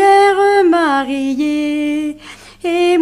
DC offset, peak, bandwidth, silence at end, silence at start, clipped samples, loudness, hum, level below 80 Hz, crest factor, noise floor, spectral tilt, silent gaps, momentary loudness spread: under 0.1%; 0 dBFS; 14 kHz; 0 s; 0 s; under 0.1%; -14 LUFS; none; -50 dBFS; 12 dB; -37 dBFS; -3.5 dB/octave; none; 13 LU